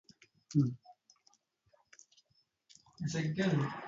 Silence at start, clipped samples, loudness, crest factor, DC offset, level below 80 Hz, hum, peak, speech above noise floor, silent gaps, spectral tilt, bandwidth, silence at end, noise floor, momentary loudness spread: 0.5 s; under 0.1%; -35 LUFS; 20 dB; under 0.1%; -72 dBFS; none; -18 dBFS; 43 dB; none; -6.5 dB/octave; 7.6 kHz; 0 s; -76 dBFS; 9 LU